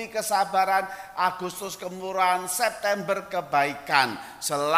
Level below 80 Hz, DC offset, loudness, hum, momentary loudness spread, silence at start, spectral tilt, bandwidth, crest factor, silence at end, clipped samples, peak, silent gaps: -66 dBFS; under 0.1%; -26 LUFS; none; 10 LU; 0 s; -2.5 dB/octave; 16 kHz; 22 dB; 0 s; under 0.1%; -4 dBFS; none